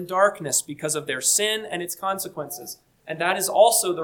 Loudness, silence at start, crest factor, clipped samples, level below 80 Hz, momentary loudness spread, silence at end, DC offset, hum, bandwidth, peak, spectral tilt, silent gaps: -22 LUFS; 0 s; 20 dB; under 0.1%; -70 dBFS; 17 LU; 0 s; under 0.1%; none; 19 kHz; -4 dBFS; -1.5 dB/octave; none